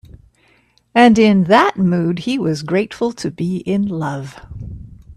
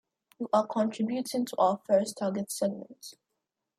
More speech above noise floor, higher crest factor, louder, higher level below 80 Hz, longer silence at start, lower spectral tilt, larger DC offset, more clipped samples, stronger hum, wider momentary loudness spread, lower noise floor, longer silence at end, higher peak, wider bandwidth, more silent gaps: second, 41 dB vs 55 dB; about the same, 16 dB vs 18 dB; first, -16 LUFS vs -29 LUFS; first, -44 dBFS vs -78 dBFS; first, 0.95 s vs 0.4 s; first, -6.5 dB/octave vs -5 dB/octave; neither; neither; neither; first, 22 LU vs 16 LU; second, -56 dBFS vs -84 dBFS; second, 0.05 s vs 0.65 s; first, 0 dBFS vs -12 dBFS; second, 12 kHz vs 15.5 kHz; neither